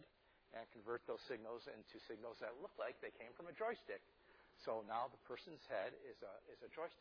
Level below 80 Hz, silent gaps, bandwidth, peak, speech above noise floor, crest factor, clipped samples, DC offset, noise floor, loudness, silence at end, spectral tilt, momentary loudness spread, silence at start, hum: -84 dBFS; none; 5.4 kHz; -32 dBFS; 23 dB; 20 dB; under 0.1%; under 0.1%; -73 dBFS; -51 LUFS; 0 s; -2.5 dB/octave; 11 LU; 0 s; none